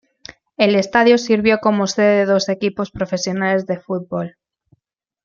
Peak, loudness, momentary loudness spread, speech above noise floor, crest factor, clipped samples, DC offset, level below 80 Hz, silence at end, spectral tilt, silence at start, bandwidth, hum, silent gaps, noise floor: -2 dBFS; -17 LUFS; 11 LU; 57 dB; 16 dB; under 0.1%; under 0.1%; -54 dBFS; 0.95 s; -5 dB/octave; 0.6 s; 7.4 kHz; none; none; -74 dBFS